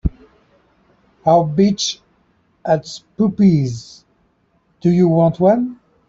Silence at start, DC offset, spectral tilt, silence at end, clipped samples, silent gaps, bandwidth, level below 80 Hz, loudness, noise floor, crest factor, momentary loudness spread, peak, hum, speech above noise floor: 0.05 s; under 0.1%; -6.5 dB/octave; 0.35 s; under 0.1%; none; 7.8 kHz; -40 dBFS; -16 LUFS; -61 dBFS; 16 dB; 14 LU; -2 dBFS; none; 46 dB